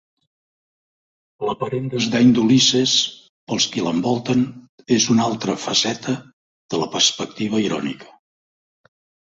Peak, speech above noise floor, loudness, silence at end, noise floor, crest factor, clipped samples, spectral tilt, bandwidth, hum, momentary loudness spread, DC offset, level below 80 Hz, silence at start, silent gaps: -2 dBFS; over 71 dB; -19 LUFS; 1.2 s; under -90 dBFS; 18 dB; under 0.1%; -3.5 dB/octave; 8 kHz; none; 13 LU; under 0.1%; -60 dBFS; 1.4 s; 3.29-3.47 s, 4.69-4.78 s, 6.33-6.69 s